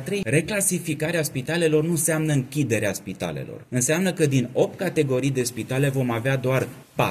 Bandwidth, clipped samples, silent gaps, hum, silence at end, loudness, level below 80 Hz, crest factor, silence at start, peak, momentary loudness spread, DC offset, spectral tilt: 15 kHz; under 0.1%; none; none; 0 s; -23 LUFS; -56 dBFS; 16 dB; 0 s; -8 dBFS; 7 LU; under 0.1%; -5 dB/octave